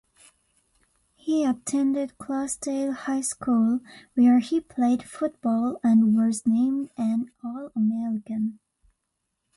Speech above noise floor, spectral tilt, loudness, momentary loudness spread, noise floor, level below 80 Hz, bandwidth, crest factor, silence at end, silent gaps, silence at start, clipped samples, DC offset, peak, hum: 55 dB; -5.5 dB/octave; -25 LUFS; 11 LU; -79 dBFS; -66 dBFS; 11.5 kHz; 14 dB; 1 s; none; 1.25 s; under 0.1%; under 0.1%; -10 dBFS; none